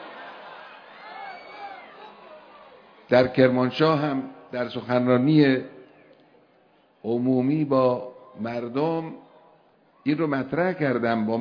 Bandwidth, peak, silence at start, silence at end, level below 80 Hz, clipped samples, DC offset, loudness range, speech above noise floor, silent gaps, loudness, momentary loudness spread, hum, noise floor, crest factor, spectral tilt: 5.4 kHz; -4 dBFS; 0 s; 0 s; -66 dBFS; under 0.1%; under 0.1%; 5 LU; 38 dB; none; -23 LUFS; 22 LU; none; -60 dBFS; 22 dB; -9 dB/octave